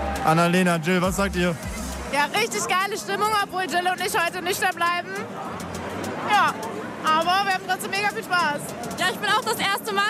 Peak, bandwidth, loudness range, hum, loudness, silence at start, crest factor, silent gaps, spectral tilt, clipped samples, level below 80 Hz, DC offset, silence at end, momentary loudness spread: -10 dBFS; 16 kHz; 2 LU; none; -23 LUFS; 0 s; 14 dB; none; -3.5 dB/octave; under 0.1%; -44 dBFS; under 0.1%; 0 s; 11 LU